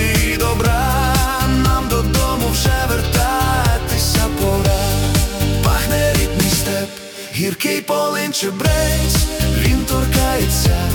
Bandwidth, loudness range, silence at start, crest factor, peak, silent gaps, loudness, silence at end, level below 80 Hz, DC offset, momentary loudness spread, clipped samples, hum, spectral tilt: 19 kHz; 2 LU; 0 s; 14 dB; -2 dBFS; none; -16 LUFS; 0 s; -22 dBFS; under 0.1%; 3 LU; under 0.1%; none; -4.5 dB/octave